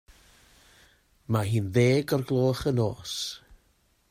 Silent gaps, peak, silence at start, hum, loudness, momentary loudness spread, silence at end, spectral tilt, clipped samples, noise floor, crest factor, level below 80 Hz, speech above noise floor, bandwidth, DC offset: none; -10 dBFS; 1.3 s; none; -26 LUFS; 10 LU; 0.55 s; -6 dB/octave; under 0.1%; -67 dBFS; 18 dB; -56 dBFS; 41 dB; 16 kHz; under 0.1%